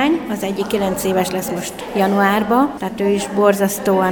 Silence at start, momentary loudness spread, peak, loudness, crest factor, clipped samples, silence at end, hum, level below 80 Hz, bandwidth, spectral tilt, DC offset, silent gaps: 0 s; 7 LU; 0 dBFS; -18 LUFS; 16 dB; under 0.1%; 0 s; none; -48 dBFS; over 20 kHz; -5 dB/octave; under 0.1%; none